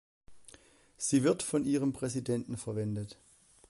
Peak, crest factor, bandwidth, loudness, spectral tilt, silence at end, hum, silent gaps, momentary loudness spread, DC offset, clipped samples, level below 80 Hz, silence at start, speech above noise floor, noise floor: -16 dBFS; 18 dB; 11.5 kHz; -32 LUFS; -5.5 dB/octave; 0.55 s; none; none; 10 LU; under 0.1%; under 0.1%; -64 dBFS; 0.3 s; 28 dB; -60 dBFS